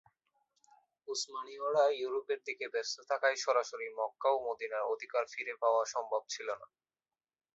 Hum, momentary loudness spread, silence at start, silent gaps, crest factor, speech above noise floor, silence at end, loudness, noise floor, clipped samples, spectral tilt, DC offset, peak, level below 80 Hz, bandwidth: none; 10 LU; 1.05 s; none; 20 dB; over 55 dB; 0.9 s; -35 LUFS; under -90 dBFS; under 0.1%; 1.5 dB/octave; under 0.1%; -16 dBFS; -88 dBFS; 7.6 kHz